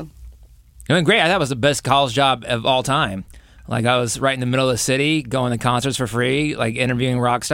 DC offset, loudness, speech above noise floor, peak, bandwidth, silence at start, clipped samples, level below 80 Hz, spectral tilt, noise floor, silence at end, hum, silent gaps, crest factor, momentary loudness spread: under 0.1%; -18 LUFS; 27 dB; -2 dBFS; 16.5 kHz; 0 s; under 0.1%; -46 dBFS; -4.5 dB/octave; -46 dBFS; 0 s; none; none; 16 dB; 6 LU